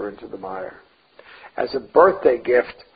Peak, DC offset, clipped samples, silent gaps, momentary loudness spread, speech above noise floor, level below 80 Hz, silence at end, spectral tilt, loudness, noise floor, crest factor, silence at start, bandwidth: -2 dBFS; under 0.1%; under 0.1%; none; 19 LU; 28 dB; -58 dBFS; 0.25 s; -10 dB/octave; -19 LUFS; -48 dBFS; 20 dB; 0 s; 5 kHz